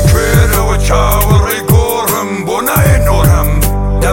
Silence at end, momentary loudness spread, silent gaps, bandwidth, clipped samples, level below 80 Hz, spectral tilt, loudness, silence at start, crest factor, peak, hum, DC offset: 0 s; 4 LU; none; 17 kHz; under 0.1%; -14 dBFS; -5 dB/octave; -11 LUFS; 0 s; 10 dB; 0 dBFS; none; 0.5%